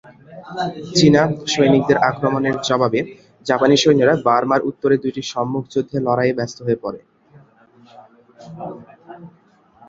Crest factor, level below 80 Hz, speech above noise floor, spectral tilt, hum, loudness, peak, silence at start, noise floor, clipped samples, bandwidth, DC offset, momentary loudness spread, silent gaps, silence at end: 18 dB; -56 dBFS; 36 dB; -5.5 dB/octave; none; -17 LUFS; 0 dBFS; 0.3 s; -54 dBFS; under 0.1%; 7.8 kHz; under 0.1%; 18 LU; none; 0.6 s